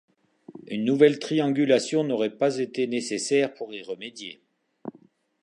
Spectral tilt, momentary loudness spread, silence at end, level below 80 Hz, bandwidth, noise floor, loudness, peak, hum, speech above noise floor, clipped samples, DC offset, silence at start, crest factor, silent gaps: -5 dB/octave; 20 LU; 0.5 s; -80 dBFS; 11 kHz; -58 dBFS; -24 LUFS; -4 dBFS; none; 34 dB; under 0.1%; under 0.1%; 0.5 s; 20 dB; none